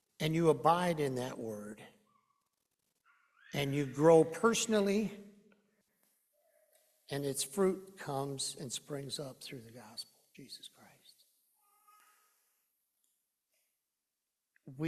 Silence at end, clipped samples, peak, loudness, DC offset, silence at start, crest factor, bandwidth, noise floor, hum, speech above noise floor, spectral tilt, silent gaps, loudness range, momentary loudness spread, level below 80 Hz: 0 s; under 0.1%; -14 dBFS; -33 LUFS; under 0.1%; 0.2 s; 24 dB; 14 kHz; -89 dBFS; none; 56 dB; -5 dB/octave; none; 16 LU; 22 LU; -72 dBFS